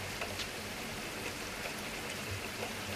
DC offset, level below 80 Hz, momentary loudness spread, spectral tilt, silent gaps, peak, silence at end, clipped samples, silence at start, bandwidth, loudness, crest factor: under 0.1%; -58 dBFS; 2 LU; -3 dB/octave; none; -24 dBFS; 0 s; under 0.1%; 0 s; 15.5 kHz; -39 LUFS; 16 dB